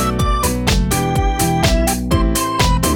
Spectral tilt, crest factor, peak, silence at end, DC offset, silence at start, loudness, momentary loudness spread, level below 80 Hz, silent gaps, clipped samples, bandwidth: -4.5 dB/octave; 14 dB; 0 dBFS; 0 s; under 0.1%; 0 s; -16 LUFS; 2 LU; -20 dBFS; none; under 0.1%; 19 kHz